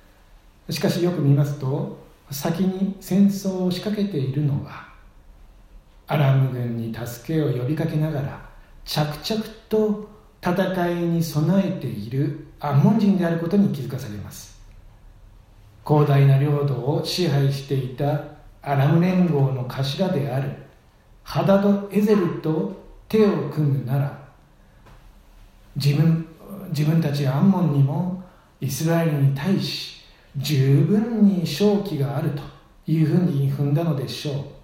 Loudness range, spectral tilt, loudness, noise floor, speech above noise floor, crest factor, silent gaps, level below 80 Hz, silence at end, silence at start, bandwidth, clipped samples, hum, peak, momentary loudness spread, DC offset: 4 LU; -7.5 dB/octave; -22 LUFS; -52 dBFS; 31 dB; 18 dB; none; -50 dBFS; 0.05 s; 0.7 s; 16 kHz; under 0.1%; none; -4 dBFS; 14 LU; under 0.1%